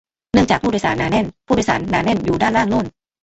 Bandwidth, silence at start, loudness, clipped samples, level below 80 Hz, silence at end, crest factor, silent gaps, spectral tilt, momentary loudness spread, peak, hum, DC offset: 8.2 kHz; 0.35 s; -18 LUFS; under 0.1%; -38 dBFS; 0.35 s; 16 dB; none; -5.5 dB/octave; 4 LU; -2 dBFS; none; under 0.1%